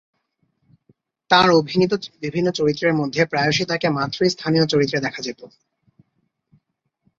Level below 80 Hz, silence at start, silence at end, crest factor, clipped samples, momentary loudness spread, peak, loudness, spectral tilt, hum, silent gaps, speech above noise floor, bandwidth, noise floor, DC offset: -58 dBFS; 1.3 s; 1.75 s; 20 dB; under 0.1%; 11 LU; -2 dBFS; -19 LUFS; -5 dB/octave; none; none; 52 dB; 7.8 kHz; -71 dBFS; under 0.1%